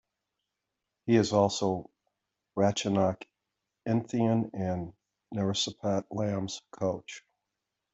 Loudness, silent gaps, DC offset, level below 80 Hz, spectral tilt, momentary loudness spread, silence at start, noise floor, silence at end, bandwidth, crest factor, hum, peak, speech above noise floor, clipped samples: -30 LUFS; none; under 0.1%; -66 dBFS; -5.5 dB/octave; 14 LU; 1.05 s; -86 dBFS; 0.75 s; 8.2 kHz; 20 dB; none; -10 dBFS; 57 dB; under 0.1%